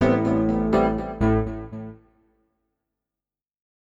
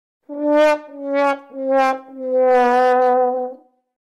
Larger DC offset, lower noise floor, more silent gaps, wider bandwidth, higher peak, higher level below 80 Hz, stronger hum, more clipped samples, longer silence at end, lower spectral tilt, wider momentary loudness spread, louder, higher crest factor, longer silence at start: neither; first, under -90 dBFS vs -37 dBFS; neither; second, 7.8 kHz vs 11 kHz; about the same, -8 dBFS vs -8 dBFS; first, -38 dBFS vs -64 dBFS; neither; neither; first, 1.9 s vs 0.5 s; first, -9 dB/octave vs -3.5 dB/octave; first, 16 LU vs 11 LU; second, -22 LUFS vs -17 LUFS; first, 18 dB vs 10 dB; second, 0 s vs 0.3 s